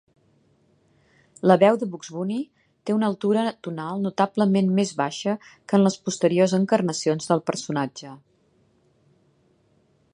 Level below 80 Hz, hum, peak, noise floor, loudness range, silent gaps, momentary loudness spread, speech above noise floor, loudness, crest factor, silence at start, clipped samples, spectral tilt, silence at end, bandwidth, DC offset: -70 dBFS; none; -2 dBFS; -63 dBFS; 3 LU; none; 12 LU; 41 dB; -23 LUFS; 22 dB; 1.45 s; under 0.1%; -6 dB/octave; 2 s; 11 kHz; under 0.1%